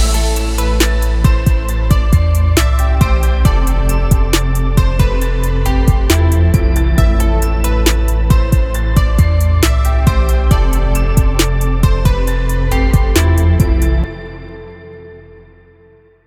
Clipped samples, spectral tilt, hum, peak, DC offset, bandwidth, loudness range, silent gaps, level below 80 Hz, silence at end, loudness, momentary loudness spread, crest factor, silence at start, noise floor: under 0.1%; -5.5 dB/octave; none; 0 dBFS; under 0.1%; 17 kHz; 2 LU; none; -14 dBFS; 1.1 s; -14 LUFS; 4 LU; 12 dB; 0 s; -46 dBFS